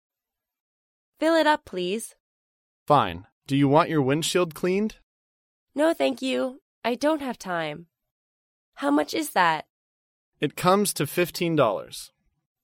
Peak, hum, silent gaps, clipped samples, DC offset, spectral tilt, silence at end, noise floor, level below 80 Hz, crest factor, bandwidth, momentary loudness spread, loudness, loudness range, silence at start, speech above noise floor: -6 dBFS; none; 2.20-2.86 s, 3.32-3.41 s, 5.03-5.67 s, 6.61-6.82 s, 8.11-8.72 s, 9.70-10.32 s; under 0.1%; under 0.1%; -5 dB/octave; 0.55 s; -88 dBFS; -62 dBFS; 20 dB; 16.5 kHz; 12 LU; -24 LUFS; 4 LU; 1.2 s; 64 dB